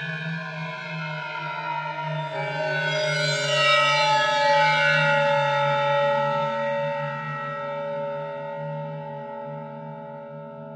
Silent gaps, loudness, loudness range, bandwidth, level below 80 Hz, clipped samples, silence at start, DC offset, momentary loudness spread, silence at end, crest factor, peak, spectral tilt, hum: none; -23 LUFS; 12 LU; 11 kHz; -76 dBFS; under 0.1%; 0 s; under 0.1%; 16 LU; 0 s; 18 dB; -8 dBFS; -4 dB/octave; none